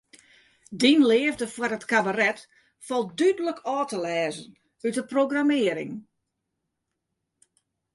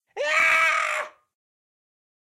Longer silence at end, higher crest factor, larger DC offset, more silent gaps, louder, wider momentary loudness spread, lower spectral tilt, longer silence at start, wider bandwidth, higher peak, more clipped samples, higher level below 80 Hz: first, 1.95 s vs 1.25 s; about the same, 20 dB vs 16 dB; neither; neither; second, -24 LUFS vs -20 LUFS; about the same, 13 LU vs 12 LU; first, -4 dB/octave vs 1 dB/octave; first, 0.7 s vs 0.15 s; second, 11.5 kHz vs 16 kHz; first, -6 dBFS vs -10 dBFS; neither; about the same, -70 dBFS vs -74 dBFS